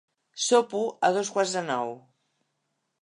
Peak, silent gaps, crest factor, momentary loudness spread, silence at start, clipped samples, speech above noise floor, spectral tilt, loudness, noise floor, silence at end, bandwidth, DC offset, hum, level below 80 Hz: -8 dBFS; none; 20 dB; 14 LU; 0.35 s; under 0.1%; 53 dB; -2.5 dB/octave; -26 LUFS; -78 dBFS; 1.05 s; 11 kHz; under 0.1%; none; -84 dBFS